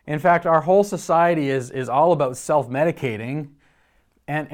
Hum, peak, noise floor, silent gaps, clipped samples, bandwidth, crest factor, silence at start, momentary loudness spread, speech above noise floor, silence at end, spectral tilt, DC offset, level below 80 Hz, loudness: none; -4 dBFS; -62 dBFS; none; under 0.1%; 16.5 kHz; 16 dB; 0.05 s; 11 LU; 42 dB; 0 s; -6 dB/octave; under 0.1%; -62 dBFS; -20 LUFS